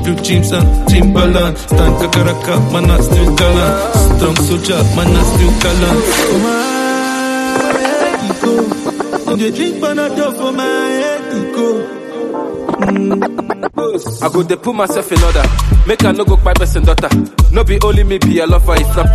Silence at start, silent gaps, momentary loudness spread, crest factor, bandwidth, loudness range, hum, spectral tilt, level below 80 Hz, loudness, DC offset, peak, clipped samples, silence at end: 0 s; none; 7 LU; 10 dB; 13.5 kHz; 5 LU; none; -5.5 dB/octave; -16 dBFS; -13 LUFS; under 0.1%; 0 dBFS; under 0.1%; 0 s